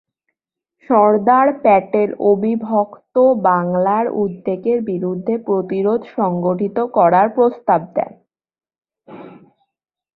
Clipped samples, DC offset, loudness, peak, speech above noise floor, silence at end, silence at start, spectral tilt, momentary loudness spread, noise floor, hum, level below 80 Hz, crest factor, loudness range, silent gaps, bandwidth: under 0.1%; under 0.1%; -16 LUFS; -2 dBFS; 64 dB; 0.8 s; 0.9 s; -11.5 dB/octave; 8 LU; -80 dBFS; none; -62 dBFS; 16 dB; 4 LU; none; 4.6 kHz